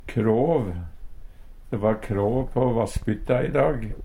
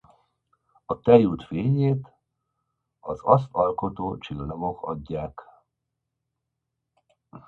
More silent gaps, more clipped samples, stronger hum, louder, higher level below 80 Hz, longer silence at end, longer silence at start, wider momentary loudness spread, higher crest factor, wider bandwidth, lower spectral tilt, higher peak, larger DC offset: neither; neither; neither; about the same, -24 LUFS vs -24 LUFS; first, -36 dBFS vs -52 dBFS; about the same, 0 s vs 0.1 s; second, 0 s vs 0.9 s; second, 10 LU vs 16 LU; second, 16 dB vs 26 dB; first, 16 kHz vs 4.4 kHz; second, -8 dB/octave vs -10 dB/octave; second, -8 dBFS vs -2 dBFS; neither